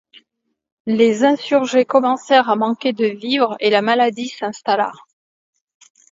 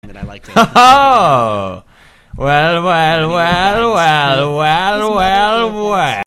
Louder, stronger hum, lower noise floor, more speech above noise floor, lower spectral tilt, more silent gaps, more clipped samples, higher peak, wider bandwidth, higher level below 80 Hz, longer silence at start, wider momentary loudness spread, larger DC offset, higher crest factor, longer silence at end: second, -17 LUFS vs -11 LUFS; neither; first, -73 dBFS vs -36 dBFS; first, 57 dB vs 24 dB; about the same, -4.5 dB/octave vs -4.5 dB/octave; neither; second, under 0.1% vs 0.2%; about the same, 0 dBFS vs 0 dBFS; second, 7.8 kHz vs 16 kHz; second, -72 dBFS vs -36 dBFS; first, 0.85 s vs 0.05 s; about the same, 10 LU vs 10 LU; neither; first, 18 dB vs 12 dB; first, 1.2 s vs 0.05 s